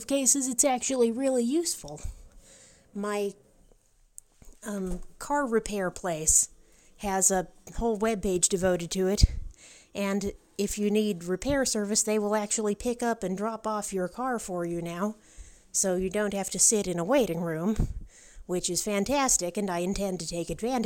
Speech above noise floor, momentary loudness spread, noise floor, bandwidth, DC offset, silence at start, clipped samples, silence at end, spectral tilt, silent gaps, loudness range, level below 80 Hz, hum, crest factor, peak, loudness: 34 dB; 12 LU; -61 dBFS; 17 kHz; under 0.1%; 0 s; under 0.1%; 0 s; -3.5 dB/octave; none; 7 LU; -40 dBFS; none; 22 dB; -6 dBFS; -27 LUFS